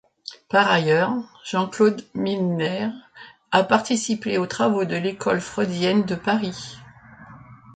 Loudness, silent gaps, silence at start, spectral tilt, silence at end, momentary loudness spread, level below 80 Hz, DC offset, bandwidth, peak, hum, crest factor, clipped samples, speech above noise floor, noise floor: -22 LUFS; none; 0.3 s; -5 dB/octave; 0.05 s; 11 LU; -62 dBFS; under 0.1%; 9.4 kHz; -2 dBFS; none; 20 dB; under 0.1%; 23 dB; -45 dBFS